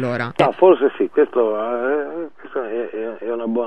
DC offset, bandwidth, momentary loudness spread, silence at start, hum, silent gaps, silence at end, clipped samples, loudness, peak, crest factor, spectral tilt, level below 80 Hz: 0.7%; 8.4 kHz; 14 LU; 0 s; none; none; 0 s; under 0.1%; -19 LUFS; 0 dBFS; 18 dB; -7.5 dB/octave; -64 dBFS